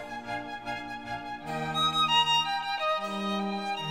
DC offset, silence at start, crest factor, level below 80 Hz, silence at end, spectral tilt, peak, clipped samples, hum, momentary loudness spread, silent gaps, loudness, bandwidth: 0.1%; 0 s; 16 dB; -62 dBFS; 0 s; -3.5 dB/octave; -14 dBFS; under 0.1%; none; 14 LU; none; -29 LUFS; 16 kHz